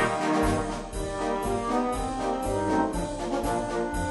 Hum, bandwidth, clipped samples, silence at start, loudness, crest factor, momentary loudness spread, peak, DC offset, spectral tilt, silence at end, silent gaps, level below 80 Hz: none; 11.5 kHz; under 0.1%; 0 s; -28 LUFS; 16 dB; 6 LU; -12 dBFS; under 0.1%; -5.5 dB/octave; 0 s; none; -38 dBFS